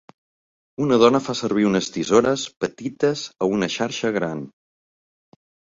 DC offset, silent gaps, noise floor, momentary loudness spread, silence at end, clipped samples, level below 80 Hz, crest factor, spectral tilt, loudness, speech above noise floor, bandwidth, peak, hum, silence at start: under 0.1%; none; under -90 dBFS; 11 LU; 1.25 s; under 0.1%; -58 dBFS; 20 dB; -5 dB/octave; -21 LUFS; over 69 dB; 7.8 kHz; -2 dBFS; none; 0.8 s